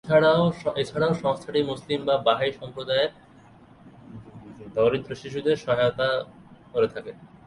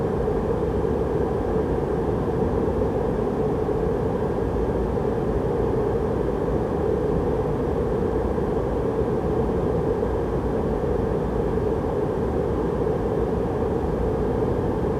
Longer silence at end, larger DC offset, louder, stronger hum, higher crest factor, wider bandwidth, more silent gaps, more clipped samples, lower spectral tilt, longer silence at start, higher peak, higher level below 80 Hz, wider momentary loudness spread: first, 0.2 s vs 0 s; neither; about the same, -25 LUFS vs -24 LUFS; neither; first, 20 dB vs 14 dB; second, 11 kHz vs 13 kHz; neither; neither; second, -6.5 dB/octave vs -9 dB/octave; about the same, 0.05 s vs 0 s; about the same, -6 dBFS vs -8 dBFS; second, -58 dBFS vs -32 dBFS; first, 20 LU vs 1 LU